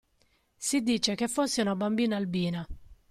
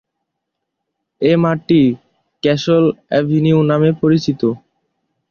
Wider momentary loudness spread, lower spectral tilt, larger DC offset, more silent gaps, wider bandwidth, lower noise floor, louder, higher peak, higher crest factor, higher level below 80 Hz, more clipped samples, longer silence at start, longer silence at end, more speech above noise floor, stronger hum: about the same, 7 LU vs 7 LU; second, -4 dB/octave vs -7.5 dB/octave; neither; neither; first, 14.5 kHz vs 6.8 kHz; second, -69 dBFS vs -77 dBFS; second, -29 LUFS vs -15 LUFS; second, -12 dBFS vs -2 dBFS; about the same, 18 dB vs 14 dB; about the same, -54 dBFS vs -54 dBFS; neither; second, 0.6 s vs 1.2 s; second, 0.15 s vs 0.75 s; second, 41 dB vs 63 dB; neither